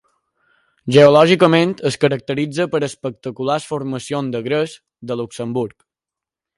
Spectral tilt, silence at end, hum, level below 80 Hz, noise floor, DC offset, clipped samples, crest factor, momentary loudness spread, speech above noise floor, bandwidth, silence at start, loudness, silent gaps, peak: -6 dB/octave; 0.9 s; none; -60 dBFS; -87 dBFS; under 0.1%; under 0.1%; 18 dB; 16 LU; 71 dB; 11.5 kHz; 0.85 s; -17 LUFS; none; 0 dBFS